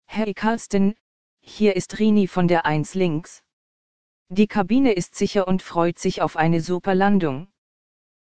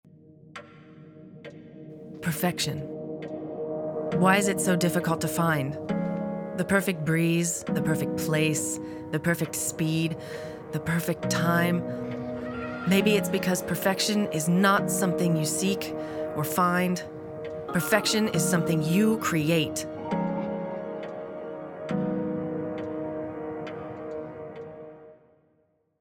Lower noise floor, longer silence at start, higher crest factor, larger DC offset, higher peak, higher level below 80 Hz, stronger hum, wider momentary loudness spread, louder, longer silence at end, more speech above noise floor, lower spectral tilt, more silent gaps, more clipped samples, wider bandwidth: first, under -90 dBFS vs -69 dBFS; second, 0 s vs 0.3 s; about the same, 18 dB vs 20 dB; first, 1% vs under 0.1%; about the same, -4 dBFS vs -6 dBFS; first, -48 dBFS vs -62 dBFS; neither; second, 5 LU vs 14 LU; first, -21 LUFS vs -27 LUFS; second, 0.65 s vs 0.85 s; first, over 70 dB vs 44 dB; first, -6.5 dB/octave vs -5 dB/octave; first, 1.01-1.37 s, 3.53-4.26 s vs none; neither; second, 9.4 kHz vs 19 kHz